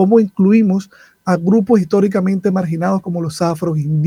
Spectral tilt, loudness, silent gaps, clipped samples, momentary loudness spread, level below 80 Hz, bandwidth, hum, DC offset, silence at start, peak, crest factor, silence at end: -8 dB/octave; -15 LUFS; none; under 0.1%; 7 LU; -54 dBFS; 11.5 kHz; none; under 0.1%; 0 s; 0 dBFS; 14 dB; 0 s